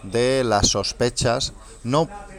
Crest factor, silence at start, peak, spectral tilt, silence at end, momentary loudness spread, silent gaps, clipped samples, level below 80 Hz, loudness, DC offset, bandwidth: 18 dB; 0 s; -4 dBFS; -3.5 dB/octave; 0 s; 7 LU; none; under 0.1%; -38 dBFS; -21 LUFS; under 0.1%; 15.5 kHz